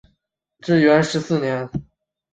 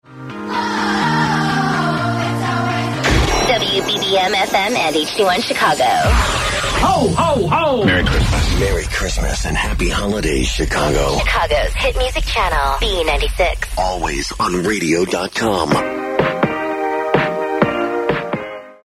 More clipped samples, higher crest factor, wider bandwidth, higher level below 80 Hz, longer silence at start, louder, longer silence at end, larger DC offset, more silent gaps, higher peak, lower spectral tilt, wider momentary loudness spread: neither; about the same, 18 dB vs 16 dB; second, 9 kHz vs 15.5 kHz; second, -52 dBFS vs -24 dBFS; first, 0.65 s vs 0.1 s; about the same, -18 LUFS vs -16 LUFS; first, 0.5 s vs 0.15 s; neither; neither; second, -4 dBFS vs 0 dBFS; first, -6 dB/octave vs -4.5 dB/octave; first, 17 LU vs 5 LU